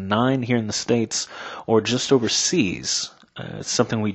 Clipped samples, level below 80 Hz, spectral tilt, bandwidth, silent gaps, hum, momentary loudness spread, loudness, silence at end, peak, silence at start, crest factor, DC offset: under 0.1%; -58 dBFS; -4 dB/octave; 8.4 kHz; none; none; 13 LU; -21 LUFS; 0 s; -2 dBFS; 0 s; 20 dB; under 0.1%